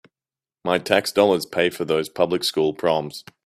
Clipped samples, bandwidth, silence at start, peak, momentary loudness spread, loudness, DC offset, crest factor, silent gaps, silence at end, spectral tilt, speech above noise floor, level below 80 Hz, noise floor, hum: under 0.1%; 16 kHz; 0.65 s; 0 dBFS; 6 LU; -21 LUFS; under 0.1%; 22 dB; none; 0.25 s; -4 dB/octave; over 69 dB; -62 dBFS; under -90 dBFS; none